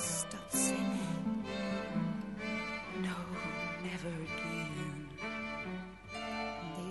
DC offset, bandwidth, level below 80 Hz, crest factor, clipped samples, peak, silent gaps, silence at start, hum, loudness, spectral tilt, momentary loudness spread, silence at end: under 0.1%; 11.5 kHz; -60 dBFS; 18 dB; under 0.1%; -20 dBFS; none; 0 s; none; -38 LUFS; -4 dB/octave; 8 LU; 0 s